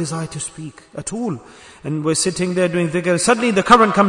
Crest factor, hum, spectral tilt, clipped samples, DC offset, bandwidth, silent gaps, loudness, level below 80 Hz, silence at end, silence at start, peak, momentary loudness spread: 18 dB; none; -4.5 dB/octave; under 0.1%; under 0.1%; 11 kHz; none; -18 LUFS; -50 dBFS; 0 s; 0 s; 0 dBFS; 19 LU